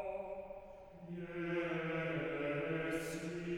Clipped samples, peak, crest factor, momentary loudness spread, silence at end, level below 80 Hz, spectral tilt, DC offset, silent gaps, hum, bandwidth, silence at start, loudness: under 0.1%; -26 dBFS; 14 dB; 13 LU; 0 s; -64 dBFS; -6 dB/octave; under 0.1%; none; none; 19 kHz; 0 s; -41 LUFS